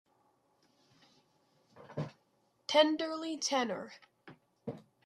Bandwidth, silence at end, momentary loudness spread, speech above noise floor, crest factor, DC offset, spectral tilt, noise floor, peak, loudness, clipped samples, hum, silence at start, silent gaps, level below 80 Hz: 12.5 kHz; 0.25 s; 20 LU; 42 dB; 24 dB; under 0.1%; -3.5 dB/octave; -74 dBFS; -12 dBFS; -33 LUFS; under 0.1%; none; 1.75 s; none; -84 dBFS